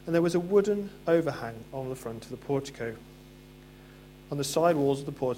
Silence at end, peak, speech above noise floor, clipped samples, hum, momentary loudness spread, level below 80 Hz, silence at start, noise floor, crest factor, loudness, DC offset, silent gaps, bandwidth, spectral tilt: 0 s; -12 dBFS; 22 dB; under 0.1%; none; 14 LU; -58 dBFS; 0 s; -50 dBFS; 18 dB; -29 LUFS; under 0.1%; none; 16.5 kHz; -6 dB/octave